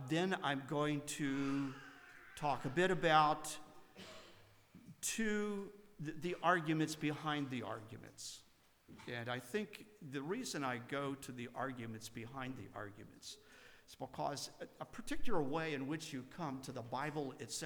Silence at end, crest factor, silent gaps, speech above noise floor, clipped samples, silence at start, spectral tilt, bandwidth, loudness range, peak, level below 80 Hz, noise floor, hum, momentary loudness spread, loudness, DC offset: 0 s; 22 dB; none; 23 dB; under 0.1%; 0 s; -4.5 dB/octave; over 20 kHz; 9 LU; -18 dBFS; -62 dBFS; -63 dBFS; none; 19 LU; -41 LUFS; under 0.1%